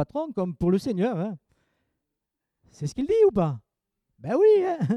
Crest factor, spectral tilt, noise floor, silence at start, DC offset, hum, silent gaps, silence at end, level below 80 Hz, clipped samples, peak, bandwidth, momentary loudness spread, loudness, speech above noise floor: 16 dB; -8 dB/octave; -84 dBFS; 0 s; under 0.1%; none; none; 0 s; -54 dBFS; under 0.1%; -10 dBFS; 10.5 kHz; 16 LU; -24 LUFS; 61 dB